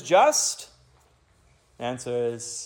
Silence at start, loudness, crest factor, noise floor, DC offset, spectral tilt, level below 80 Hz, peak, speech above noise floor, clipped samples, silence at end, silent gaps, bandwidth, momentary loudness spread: 0 s; -24 LUFS; 18 dB; -61 dBFS; under 0.1%; -2 dB/octave; -66 dBFS; -8 dBFS; 37 dB; under 0.1%; 0 s; none; 17.5 kHz; 17 LU